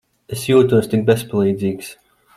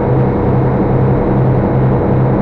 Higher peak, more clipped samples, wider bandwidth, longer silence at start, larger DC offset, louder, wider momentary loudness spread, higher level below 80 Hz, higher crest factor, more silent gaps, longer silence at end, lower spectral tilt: about the same, -2 dBFS vs -4 dBFS; neither; first, 15 kHz vs 4.1 kHz; first, 0.3 s vs 0 s; neither; second, -17 LUFS vs -12 LUFS; first, 17 LU vs 1 LU; second, -54 dBFS vs -24 dBFS; first, 16 dB vs 8 dB; neither; first, 0.45 s vs 0 s; second, -6.5 dB/octave vs -12 dB/octave